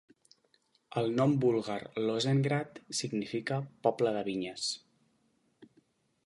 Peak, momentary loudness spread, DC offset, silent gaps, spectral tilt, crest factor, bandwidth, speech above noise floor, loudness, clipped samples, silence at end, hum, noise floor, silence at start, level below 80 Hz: -12 dBFS; 8 LU; under 0.1%; none; -5.5 dB/octave; 20 dB; 11.5 kHz; 42 dB; -32 LUFS; under 0.1%; 0.6 s; none; -73 dBFS; 0.9 s; -74 dBFS